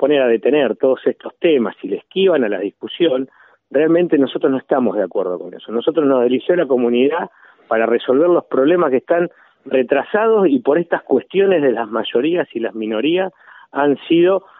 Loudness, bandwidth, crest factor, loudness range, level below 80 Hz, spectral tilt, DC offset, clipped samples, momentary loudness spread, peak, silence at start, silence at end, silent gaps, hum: -17 LUFS; 4 kHz; 14 dB; 2 LU; -72 dBFS; -4 dB/octave; under 0.1%; under 0.1%; 9 LU; -2 dBFS; 0 s; 0.2 s; none; none